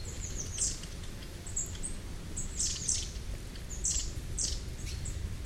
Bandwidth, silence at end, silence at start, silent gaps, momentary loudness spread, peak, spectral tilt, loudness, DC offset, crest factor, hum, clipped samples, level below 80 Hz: 16 kHz; 0 s; 0 s; none; 12 LU; -16 dBFS; -2 dB/octave; -36 LUFS; under 0.1%; 20 dB; none; under 0.1%; -40 dBFS